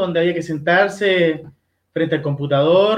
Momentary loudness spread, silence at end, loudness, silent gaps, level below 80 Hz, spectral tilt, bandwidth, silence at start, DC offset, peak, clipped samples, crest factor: 8 LU; 0 s; -17 LUFS; none; -60 dBFS; -6.5 dB/octave; 10.5 kHz; 0 s; under 0.1%; -2 dBFS; under 0.1%; 16 dB